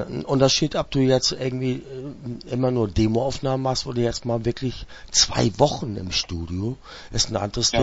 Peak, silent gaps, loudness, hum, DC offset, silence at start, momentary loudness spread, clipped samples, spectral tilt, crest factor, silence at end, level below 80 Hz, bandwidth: -2 dBFS; none; -23 LUFS; none; under 0.1%; 0 s; 12 LU; under 0.1%; -4.5 dB/octave; 20 dB; 0 s; -40 dBFS; 8 kHz